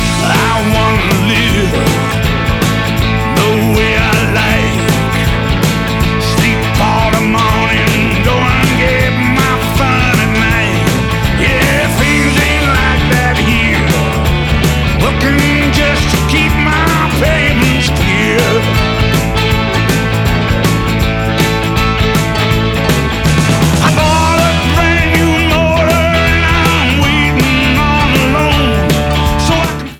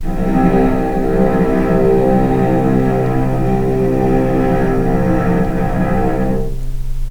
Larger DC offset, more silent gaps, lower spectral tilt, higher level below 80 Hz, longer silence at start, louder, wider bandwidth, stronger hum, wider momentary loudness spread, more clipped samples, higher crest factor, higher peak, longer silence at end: neither; neither; second, -5 dB/octave vs -9 dB/octave; about the same, -20 dBFS vs -20 dBFS; about the same, 0 s vs 0 s; first, -11 LUFS vs -15 LUFS; first, 19.5 kHz vs 16.5 kHz; neither; about the same, 3 LU vs 5 LU; neither; about the same, 10 dB vs 14 dB; about the same, 0 dBFS vs 0 dBFS; about the same, 0 s vs 0 s